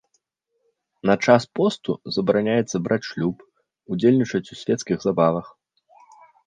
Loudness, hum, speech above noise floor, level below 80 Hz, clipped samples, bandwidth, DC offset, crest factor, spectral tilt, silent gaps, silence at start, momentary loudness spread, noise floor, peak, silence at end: -22 LUFS; none; 53 dB; -60 dBFS; under 0.1%; 9.6 kHz; under 0.1%; 20 dB; -6 dB/octave; none; 1.05 s; 10 LU; -74 dBFS; -2 dBFS; 1 s